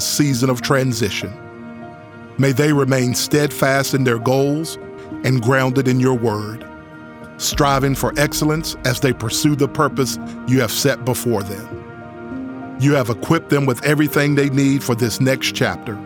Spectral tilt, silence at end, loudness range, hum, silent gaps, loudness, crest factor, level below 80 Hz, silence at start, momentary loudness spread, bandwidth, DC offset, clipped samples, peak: -5 dB/octave; 0 s; 3 LU; none; none; -17 LUFS; 16 dB; -42 dBFS; 0 s; 17 LU; over 20 kHz; under 0.1%; under 0.1%; -2 dBFS